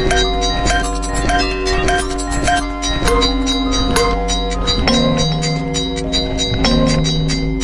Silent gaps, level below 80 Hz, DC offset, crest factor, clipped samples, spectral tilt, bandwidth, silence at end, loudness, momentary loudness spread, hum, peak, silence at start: none; -22 dBFS; under 0.1%; 14 dB; under 0.1%; -4 dB/octave; 11.5 kHz; 0 s; -16 LUFS; 4 LU; none; 0 dBFS; 0 s